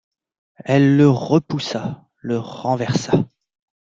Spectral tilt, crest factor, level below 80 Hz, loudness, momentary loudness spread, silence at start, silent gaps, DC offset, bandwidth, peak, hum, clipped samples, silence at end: -7 dB/octave; 18 dB; -56 dBFS; -19 LUFS; 16 LU; 0.65 s; none; under 0.1%; 7.6 kHz; -2 dBFS; none; under 0.1%; 0.55 s